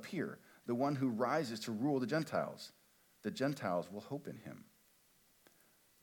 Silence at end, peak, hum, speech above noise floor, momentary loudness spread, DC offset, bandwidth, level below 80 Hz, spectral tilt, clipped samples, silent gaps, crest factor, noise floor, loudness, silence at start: 1.4 s; -22 dBFS; none; 32 dB; 16 LU; under 0.1%; 19 kHz; -86 dBFS; -6 dB/octave; under 0.1%; none; 18 dB; -71 dBFS; -39 LUFS; 0 s